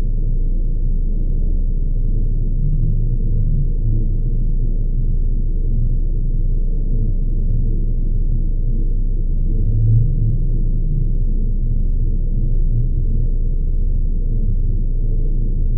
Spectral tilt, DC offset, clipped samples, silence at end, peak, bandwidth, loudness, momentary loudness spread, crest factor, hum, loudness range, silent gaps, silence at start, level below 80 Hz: -17 dB/octave; under 0.1%; under 0.1%; 0 s; -4 dBFS; 0.7 kHz; -22 LUFS; 3 LU; 10 dB; none; 2 LU; none; 0 s; -16 dBFS